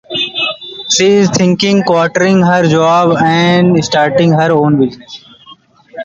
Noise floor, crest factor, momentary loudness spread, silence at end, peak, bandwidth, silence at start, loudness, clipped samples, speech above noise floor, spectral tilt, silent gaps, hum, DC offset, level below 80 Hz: -41 dBFS; 10 dB; 8 LU; 0 s; 0 dBFS; 7.8 kHz; 0.1 s; -10 LUFS; under 0.1%; 31 dB; -5 dB/octave; none; none; under 0.1%; -48 dBFS